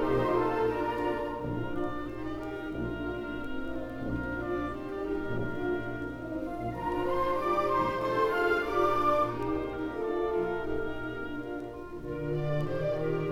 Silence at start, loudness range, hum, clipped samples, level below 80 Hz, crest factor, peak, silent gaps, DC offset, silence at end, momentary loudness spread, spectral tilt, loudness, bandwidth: 0 s; 7 LU; none; under 0.1%; -48 dBFS; 16 dB; -14 dBFS; none; under 0.1%; 0 s; 10 LU; -7.5 dB/octave; -32 LUFS; 16.5 kHz